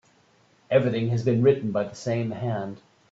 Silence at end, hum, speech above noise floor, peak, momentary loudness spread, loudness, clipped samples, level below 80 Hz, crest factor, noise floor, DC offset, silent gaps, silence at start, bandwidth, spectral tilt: 0.35 s; none; 37 dB; -6 dBFS; 9 LU; -25 LUFS; under 0.1%; -64 dBFS; 18 dB; -61 dBFS; under 0.1%; none; 0.7 s; 7.8 kHz; -7.5 dB/octave